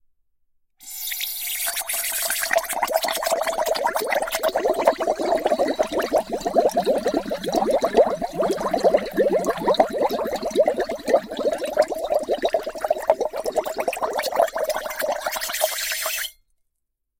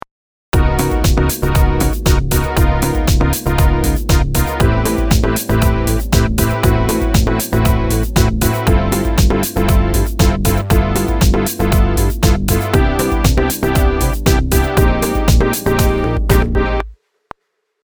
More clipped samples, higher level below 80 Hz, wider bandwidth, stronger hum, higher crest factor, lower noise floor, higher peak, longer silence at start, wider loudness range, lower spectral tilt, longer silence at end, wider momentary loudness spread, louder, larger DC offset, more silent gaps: neither; second, -52 dBFS vs -16 dBFS; second, 17 kHz vs over 20 kHz; neither; first, 20 dB vs 14 dB; first, -77 dBFS vs -66 dBFS; second, -4 dBFS vs 0 dBFS; first, 0.8 s vs 0.55 s; first, 3 LU vs 0 LU; second, -2.5 dB/octave vs -5.5 dB/octave; about the same, 0.9 s vs 0.9 s; first, 6 LU vs 2 LU; second, -23 LUFS vs -15 LUFS; neither; neither